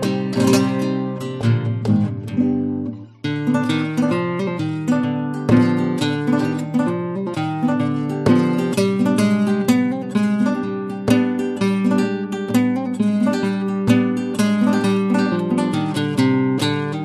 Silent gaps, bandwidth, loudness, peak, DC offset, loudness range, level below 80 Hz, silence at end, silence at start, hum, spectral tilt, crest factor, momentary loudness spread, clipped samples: none; 13 kHz; -19 LUFS; -2 dBFS; under 0.1%; 3 LU; -52 dBFS; 0 s; 0 s; none; -6.5 dB/octave; 16 dB; 6 LU; under 0.1%